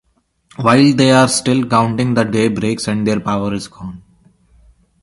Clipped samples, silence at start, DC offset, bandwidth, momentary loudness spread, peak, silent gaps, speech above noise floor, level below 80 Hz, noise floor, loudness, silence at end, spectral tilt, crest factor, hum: under 0.1%; 0.6 s; under 0.1%; 11.5 kHz; 13 LU; 0 dBFS; none; 40 dB; -48 dBFS; -54 dBFS; -14 LUFS; 1.05 s; -5 dB/octave; 16 dB; none